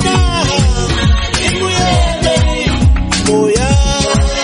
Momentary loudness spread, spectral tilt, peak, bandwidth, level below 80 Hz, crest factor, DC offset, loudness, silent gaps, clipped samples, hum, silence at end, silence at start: 2 LU; -4.5 dB/octave; 0 dBFS; 11 kHz; -16 dBFS; 12 dB; under 0.1%; -12 LUFS; none; under 0.1%; none; 0 s; 0 s